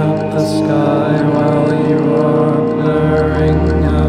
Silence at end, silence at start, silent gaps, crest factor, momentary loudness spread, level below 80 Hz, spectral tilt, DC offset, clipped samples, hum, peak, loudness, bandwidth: 0 s; 0 s; none; 10 dB; 2 LU; -26 dBFS; -8.5 dB/octave; under 0.1%; under 0.1%; none; -2 dBFS; -13 LUFS; 11 kHz